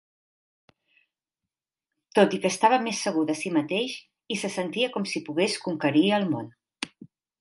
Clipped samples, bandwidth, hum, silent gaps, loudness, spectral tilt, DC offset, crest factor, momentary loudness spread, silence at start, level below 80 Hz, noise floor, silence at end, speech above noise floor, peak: under 0.1%; 11.5 kHz; none; none; -25 LUFS; -4.5 dB/octave; under 0.1%; 22 dB; 15 LU; 2.15 s; -76 dBFS; -89 dBFS; 0.35 s; 64 dB; -6 dBFS